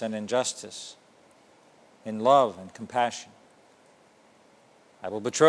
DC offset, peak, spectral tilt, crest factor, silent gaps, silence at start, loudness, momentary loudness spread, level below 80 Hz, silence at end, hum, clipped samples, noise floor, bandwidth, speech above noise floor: under 0.1%; -6 dBFS; -3.5 dB/octave; 24 dB; none; 0 s; -27 LUFS; 21 LU; -78 dBFS; 0 s; none; under 0.1%; -59 dBFS; 11 kHz; 33 dB